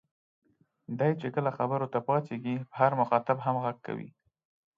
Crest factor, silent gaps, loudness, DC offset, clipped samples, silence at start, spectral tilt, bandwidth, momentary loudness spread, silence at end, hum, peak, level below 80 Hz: 22 dB; none; -30 LUFS; under 0.1%; under 0.1%; 0.9 s; -9.5 dB/octave; 7 kHz; 12 LU; 0.7 s; none; -10 dBFS; -78 dBFS